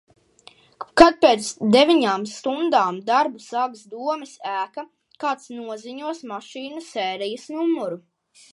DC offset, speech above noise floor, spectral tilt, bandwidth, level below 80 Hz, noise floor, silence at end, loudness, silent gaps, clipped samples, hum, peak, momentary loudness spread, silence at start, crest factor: under 0.1%; 31 dB; -4 dB/octave; 11.5 kHz; -54 dBFS; -52 dBFS; 0.55 s; -21 LUFS; none; under 0.1%; none; 0 dBFS; 18 LU; 0.8 s; 22 dB